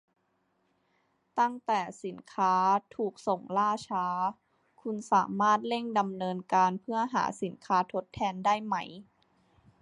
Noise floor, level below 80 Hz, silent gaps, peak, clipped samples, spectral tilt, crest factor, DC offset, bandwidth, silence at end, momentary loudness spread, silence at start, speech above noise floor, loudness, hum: -75 dBFS; -70 dBFS; none; -12 dBFS; under 0.1%; -5 dB/octave; 18 dB; under 0.1%; 11 kHz; 0.8 s; 12 LU; 1.35 s; 45 dB; -30 LUFS; none